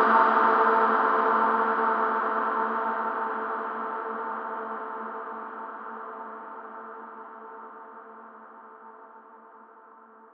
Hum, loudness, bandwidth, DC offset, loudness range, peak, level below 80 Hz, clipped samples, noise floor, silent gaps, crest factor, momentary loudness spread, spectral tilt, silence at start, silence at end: none; -25 LUFS; 5.8 kHz; under 0.1%; 20 LU; -8 dBFS; under -90 dBFS; under 0.1%; -52 dBFS; none; 20 dB; 25 LU; -6.5 dB/octave; 0 s; 0.55 s